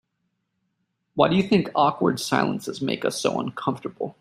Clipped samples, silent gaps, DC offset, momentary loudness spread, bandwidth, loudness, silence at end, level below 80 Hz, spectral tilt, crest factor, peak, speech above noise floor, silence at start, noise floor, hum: under 0.1%; none; under 0.1%; 9 LU; 15.5 kHz; -23 LUFS; 0.1 s; -62 dBFS; -5.5 dB/octave; 22 dB; -2 dBFS; 53 dB; 1.15 s; -76 dBFS; none